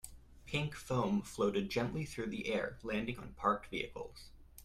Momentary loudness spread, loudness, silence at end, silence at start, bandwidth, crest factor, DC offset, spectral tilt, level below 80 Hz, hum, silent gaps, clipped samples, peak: 13 LU; -38 LUFS; 0 s; 0.05 s; 15 kHz; 20 dB; under 0.1%; -5.5 dB/octave; -58 dBFS; none; none; under 0.1%; -18 dBFS